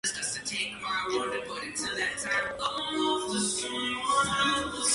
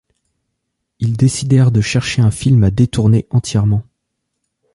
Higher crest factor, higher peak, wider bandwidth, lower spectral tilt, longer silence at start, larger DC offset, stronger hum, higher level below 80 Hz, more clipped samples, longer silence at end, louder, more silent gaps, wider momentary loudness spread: about the same, 16 dB vs 14 dB; second, -14 dBFS vs -2 dBFS; about the same, 11.5 kHz vs 11.5 kHz; second, -1.5 dB/octave vs -6.5 dB/octave; second, 0.05 s vs 1 s; neither; neither; second, -58 dBFS vs -36 dBFS; neither; second, 0 s vs 0.9 s; second, -29 LUFS vs -14 LUFS; neither; about the same, 6 LU vs 5 LU